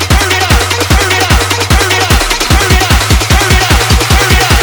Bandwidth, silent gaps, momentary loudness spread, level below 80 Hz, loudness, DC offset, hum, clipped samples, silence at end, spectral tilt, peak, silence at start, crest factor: over 20 kHz; none; 2 LU; -14 dBFS; -8 LUFS; under 0.1%; none; 0.9%; 0 s; -3.5 dB/octave; 0 dBFS; 0 s; 8 dB